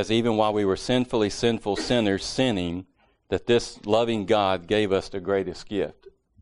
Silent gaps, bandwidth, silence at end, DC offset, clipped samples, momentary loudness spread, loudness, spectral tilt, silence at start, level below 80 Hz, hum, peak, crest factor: none; 10.5 kHz; 0.35 s; under 0.1%; under 0.1%; 7 LU; -25 LUFS; -5 dB/octave; 0 s; -50 dBFS; none; -6 dBFS; 18 dB